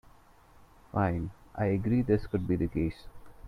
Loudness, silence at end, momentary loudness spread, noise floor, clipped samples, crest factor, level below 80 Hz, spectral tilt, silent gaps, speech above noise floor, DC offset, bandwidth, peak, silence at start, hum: -31 LUFS; 0 s; 9 LU; -58 dBFS; under 0.1%; 18 dB; -48 dBFS; -10 dB/octave; none; 29 dB; under 0.1%; 12 kHz; -14 dBFS; 0.6 s; none